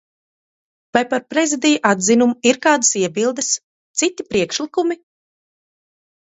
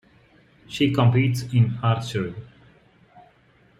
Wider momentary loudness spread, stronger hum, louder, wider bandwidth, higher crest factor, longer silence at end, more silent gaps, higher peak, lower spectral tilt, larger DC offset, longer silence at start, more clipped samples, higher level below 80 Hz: second, 7 LU vs 14 LU; neither; first, -17 LUFS vs -22 LUFS; second, 8.2 kHz vs 12.5 kHz; about the same, 18 dB vs 18 dB; about the same, 1.45 s vs 1.35 s; first, 3.64-3.94 s vs none; first, 0 dBFS vs -6 dBFS; second, -2.5 dB/octave vs -7 dB/octave; neither; first, 0.95 s vs 0.7 s; neither; about the same, -60 dBFS vs -56 dBFS